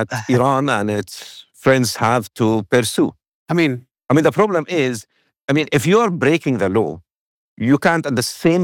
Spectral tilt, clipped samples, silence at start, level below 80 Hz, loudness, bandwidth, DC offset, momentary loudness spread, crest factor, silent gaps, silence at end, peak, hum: -5.5 dB/octave; under 0.1%; 0 s; -60 dBFS; -17 LUFS; 17.5 kHz; under 0.1%; 10 LU; 14 dB; 3.28-3.46 s, 5.44-5.48 s, 7.16-7.57 s; 0 s; -4 dBFS; none